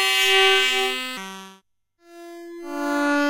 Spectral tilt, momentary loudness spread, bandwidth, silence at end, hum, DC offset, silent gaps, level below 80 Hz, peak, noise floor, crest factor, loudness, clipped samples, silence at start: -0.5 dB/octave; 24 LU; 16.5 kHz; 0 s; none; under 0.1%; none; -66 dBFS; -4 dBFS; -62 dBFS; 18 dB; -19 LUFS; under 0.1%; 0 s